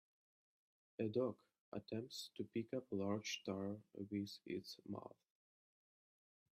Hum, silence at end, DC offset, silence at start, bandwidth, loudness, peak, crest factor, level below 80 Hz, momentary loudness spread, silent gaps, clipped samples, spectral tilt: none; 1.45 s; under 0.1%; 1 s; 14 kHz; -47 LUFS; -28 dBFS; 20 dB; -86 dBFS; 10 LU; 1.61-1.72 s; under 0.1%; -5.5 dB/octave